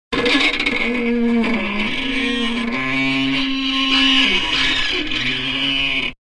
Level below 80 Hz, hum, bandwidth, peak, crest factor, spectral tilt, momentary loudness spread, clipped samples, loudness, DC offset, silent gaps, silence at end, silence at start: -36 dBFS; none; 11 kHz; -2 dBFS; 16 dB; -3.5 dB/octave; 6 LU; under 0.1%; -17 LUFS; under 0.1%; none; 0.1 s; 0.1 s